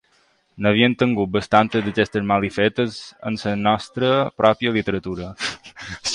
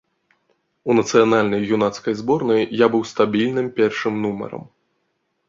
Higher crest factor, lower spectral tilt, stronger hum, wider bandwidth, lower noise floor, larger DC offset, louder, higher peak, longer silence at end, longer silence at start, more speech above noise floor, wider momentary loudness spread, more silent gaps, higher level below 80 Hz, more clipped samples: about the same, 20 dB vs 18 dB; about the same, -5.5 dB/octave vs -5.5 dB/octave; neither; first, 11 kHz vs 7.8 kHz; second, -61 dBFS vs -71 dBFS; neither; about the same, -20 LUFS vs -19 LUFS; about the same, 0 dBFS vs -2 dBFS; second, 0 s vs 0.85 s; second, 0.55 s vs 0.85 s; second, 41 dB vs 52 dB; about the same, 10 LU vs 10 LU; neither; first, -50 dBFS vs -60 dBFS; neither